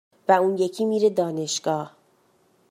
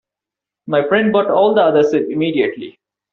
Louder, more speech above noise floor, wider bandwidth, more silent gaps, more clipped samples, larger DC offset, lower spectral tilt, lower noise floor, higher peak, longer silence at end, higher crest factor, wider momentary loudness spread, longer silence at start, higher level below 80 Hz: second, -23 LUFS vs -15 LUFS; second, 40 dB vs 71 dB; first, 15.5 kHz vs 6.8 kHz; neither; neither; neither; about the same, -4.5 dB/octave vs -4 dB/octave; second, -62 dBFS vs -86 dBFS; about the same, -4 dBFS vs -2 dBFS; first, 0.8 s vs 0.45 s; first, 20 dB vs 14 dB; about the same, 8 LU vs 8 LU; second, 0.3 s vs 0.65 s; second, -76 dBFS vs -60 dBFS